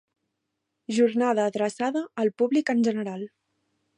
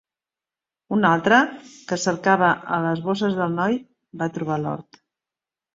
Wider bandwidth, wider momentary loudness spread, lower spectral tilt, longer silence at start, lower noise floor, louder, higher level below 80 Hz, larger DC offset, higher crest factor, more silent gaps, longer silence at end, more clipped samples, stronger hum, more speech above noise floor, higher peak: first, 10.5 kHz vs 7.8 kHz; about the same, 13 LU vs 12 LU; about the same, -5.5 dB/octave vs -5.5 dB/octave; about the same, 0.9 s vs 0.9 s; second, -81 dBFS vs -90 dBFS; second, -25 LUFS vs -21 LUFS; second, -78 dBFS vs -64 dBFS; neither; about the same, 16 dB vs 20 dB; neither; second, 0.7 s vs 0.95 s; neither; neither; second, 56 dB vs 69 dB; second, -10 dBFS vs -2 dBFS